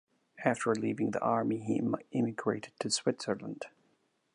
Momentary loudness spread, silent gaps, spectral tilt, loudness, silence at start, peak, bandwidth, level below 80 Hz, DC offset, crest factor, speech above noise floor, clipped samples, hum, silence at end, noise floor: 7 LU; none; -4.5 dB/octave; -33 LUFS; 0.35 s; -14 dBFS; 11 kHz; -76 dBFS; under 0.1%; 20 dB; 41 dB; under 0.1%; none; 0.65 s; -74 dBFS